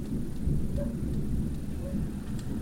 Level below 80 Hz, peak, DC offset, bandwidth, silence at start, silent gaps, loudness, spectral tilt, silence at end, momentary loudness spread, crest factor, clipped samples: -36 dBFS; -18 dBFS; 0.2%; 16 kHz; 0 s; none; -34 LUFS; -8 dB/octave; 0 s; 4 LU; 12 dB; under 0.1%